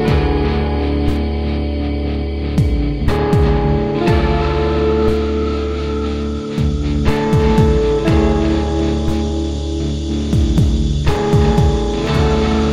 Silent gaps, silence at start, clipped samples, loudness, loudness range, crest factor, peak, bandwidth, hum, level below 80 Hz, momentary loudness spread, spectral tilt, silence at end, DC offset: none; 0 s; under 0.1%; -16 LUFS; 2 LU; 14 dB; 0 dBFS; 10.5 kHz; none; -20 dBFS; 6 LU; -7.5 dB/octave; 0 s; under 0.1%